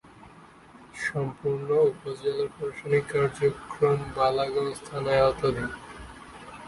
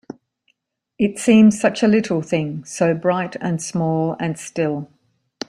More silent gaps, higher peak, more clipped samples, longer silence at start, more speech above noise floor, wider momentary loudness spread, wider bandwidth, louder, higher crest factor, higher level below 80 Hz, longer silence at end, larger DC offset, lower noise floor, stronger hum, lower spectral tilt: neither; second, -10 dBFS vs -2 dBFS; neither; about the same, 0.05 s vs 0.1 s; second, 25 dB vs 51 dB; first, 19 LU vs 12 LU; about the same, 11.5 kHz vs 11.5 kHz; second, -27 LUFS vs -19 LUFS; about the same, 18 dB vs 16 dB; first, -52 dBFS vs -60 dBFS; second, 0 s vs 0.65 s; neither; second, -51 dBFS vs -69 dBFS; neither; about the same, -6 dB/octave vs -6 dB/octave